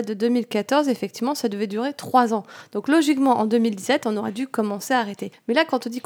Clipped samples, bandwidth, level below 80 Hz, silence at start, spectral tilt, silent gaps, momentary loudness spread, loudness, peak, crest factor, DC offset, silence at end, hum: under 0.1%; 19.5 kHz; -76 dBFS; 0 s; -4.5 dB/octave; none; 8 LU; -22 LUFS; -4 dBFS; 18 dB; under 0.1%; 0.05 s; none